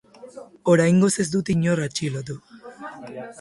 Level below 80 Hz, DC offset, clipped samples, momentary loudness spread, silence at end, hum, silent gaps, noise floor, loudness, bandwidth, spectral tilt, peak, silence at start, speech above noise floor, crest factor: -56 dBFS; under 0.1%; under 0.1%; 21 LU; 0 s; none; none; -43 dBFS; -21 LUFS; 11.5 kHz; -5.5 dB/octave; -6 dBFS; 0.2 s; 22 dB; 18 dB